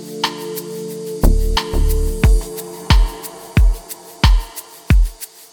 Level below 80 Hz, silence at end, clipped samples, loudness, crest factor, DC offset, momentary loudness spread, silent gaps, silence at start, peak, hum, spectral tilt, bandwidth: -16 dBFS; 0.25 s; under 0.1%; -19 LUFS; 14 dB; under 0.1%; 13 LU; none; 0 s; -2 dBFS; none; -5 dB/octave; 19.5 kHz